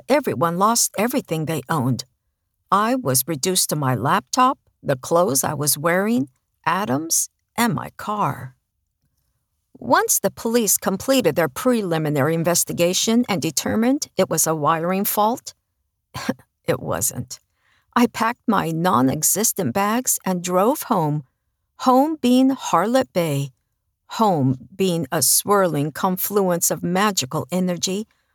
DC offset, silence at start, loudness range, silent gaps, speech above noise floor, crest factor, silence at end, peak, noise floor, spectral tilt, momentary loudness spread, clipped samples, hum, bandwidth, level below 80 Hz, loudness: under 0.1%; 0.1 s; 4 LU; none; 54 dB; 18 dB; 0.3 s; -4 dBFS; -74 dBFS; -4 dB/octave; 9 LU; under 0.1%; none; over 20 kHz; -60 dBFS; -20 LUFS